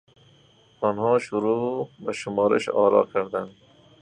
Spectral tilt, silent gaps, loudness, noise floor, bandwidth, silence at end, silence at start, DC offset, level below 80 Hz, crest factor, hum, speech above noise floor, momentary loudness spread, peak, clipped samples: -6 dB/octave; none; -24 LUFS; -57 dBFS; 10 kHz; 0.5 s; 0.8 s; under 0.1%; -66 dBFS; 18 dB; none; 34 dB; 12 LU; -6 dBFS; under 0.1%